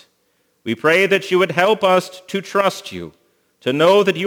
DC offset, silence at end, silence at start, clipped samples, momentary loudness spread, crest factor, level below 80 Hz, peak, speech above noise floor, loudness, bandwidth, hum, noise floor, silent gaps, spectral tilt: under 0.1%; 0 s; 0.65 s; under 0.1%; 17 LU; 18 dB; -64 dBFS; 0 dBFS; 47 dB; -16 LUFS; over 20 kHz; none; -64 dBFS; none; -4.5 dB/octave